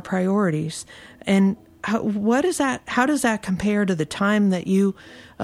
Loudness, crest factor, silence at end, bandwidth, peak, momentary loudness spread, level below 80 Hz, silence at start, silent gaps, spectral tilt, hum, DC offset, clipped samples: -22 LUFS; 16 dB; 0 s; 13.5 kHz; -4 dBFS; 11 LU; -54 dBFS; 0.05 s; none; -5.5 dB/octave; none; under 0.1%; under 0.1%